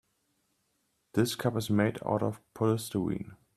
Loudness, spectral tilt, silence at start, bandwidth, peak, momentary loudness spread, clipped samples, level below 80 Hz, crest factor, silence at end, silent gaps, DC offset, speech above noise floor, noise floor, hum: -31 LUFS; -6 dB/octave; 1.15 s; 14.5 kHz; -12 dBFS; 6 LU; under 0.1%; -64 dBFS; 20 dB; 0.2 s; none; under 0.1%; 46 dB; -76 dBFS; none